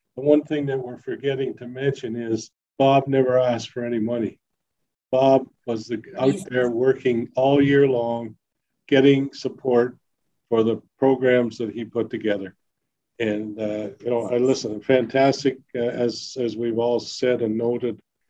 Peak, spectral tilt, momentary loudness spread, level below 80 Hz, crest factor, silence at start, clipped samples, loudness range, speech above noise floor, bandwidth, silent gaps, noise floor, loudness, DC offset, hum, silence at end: -4 dBFS; -6.5 dB/octave; 11 LU; -66 dBFS; 18 dB; 0.15 s; under 0.1%; 4 LU; 59 dB; 10.5 kHz; none; -80 dBFS; -22 LUFS; under 0.1%; none; 0.35 s